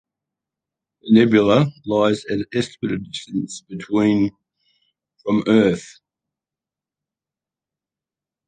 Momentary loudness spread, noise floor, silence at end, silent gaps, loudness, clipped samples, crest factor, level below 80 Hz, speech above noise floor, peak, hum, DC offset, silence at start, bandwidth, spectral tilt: 14 LU; -89 dBFS; 2.6 s; none; -19 LUFS; under 0.1%; 20 dB; -56 dBFS; 71 dB; -2 dBFS; none; under 0.1%; 1.05 s; 9.4 kHz; -6.5 dB/octave